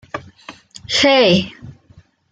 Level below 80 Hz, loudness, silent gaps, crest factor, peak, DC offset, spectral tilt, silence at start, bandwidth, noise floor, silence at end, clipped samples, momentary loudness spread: -54 dBFS; -13 LUFS; none; 16 dB; -2 dBFS; under 0.1%; -4 dB/octave; 0.15 s; 9.4 kHz; -49 dBFS; 0.6 s; under 0.1%; 25 LU